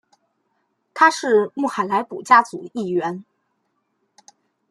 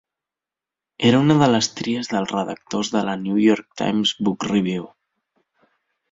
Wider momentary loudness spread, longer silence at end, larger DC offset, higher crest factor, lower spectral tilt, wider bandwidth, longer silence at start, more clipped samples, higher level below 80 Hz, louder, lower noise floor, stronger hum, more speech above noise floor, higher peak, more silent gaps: first, 14 LU vs 10 LU; first, 1.5 s vs 1.25 s; neither; about the same, 20 dB vs 18 dB; about the same, -4.5 dB/octave vs -5 dB/octave; first, 12.5 kHz vs 7.8 kHz; about the same, 0.95 s vs 1 s; neither; second, -74 dBFS vs -60 dBFS; about the same, -19 LUFS vs -20 LUFS; second, -71 dBFS vs -88 dBFS; neither; second, 52 dB vs 69 dB; about the same, -2 dBFS vs -2 dBFS; neither